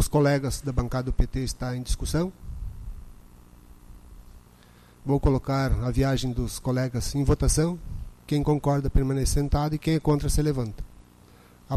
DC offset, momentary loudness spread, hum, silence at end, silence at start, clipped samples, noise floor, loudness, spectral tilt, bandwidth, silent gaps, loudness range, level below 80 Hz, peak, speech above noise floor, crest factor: under 0.1%; 16 LU; 60 Hz at -50 dBFS; 0 s; 0 s; under 0.1%; -53 dBFS; -26 LUFS; -6 dB/octave; 13.5 kHz; none; 8 LU; -32 dBFS; -12 dBFS; 29 dB; 14 dB